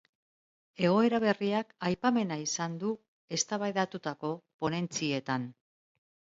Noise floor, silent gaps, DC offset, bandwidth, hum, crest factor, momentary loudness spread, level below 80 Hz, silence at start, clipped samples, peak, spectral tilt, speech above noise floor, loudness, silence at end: under -90 dBFS; 3.08-3.28 s, 4.54-4.59 s; under 0.1%; 8 kHz; none; 20 dB; 10 LU; -72 dBFS; 0.8 s; under 0.1%; -12 dBFS; -4.5 dB/octave; over 59 dB; -31 LUFS; 0.8 s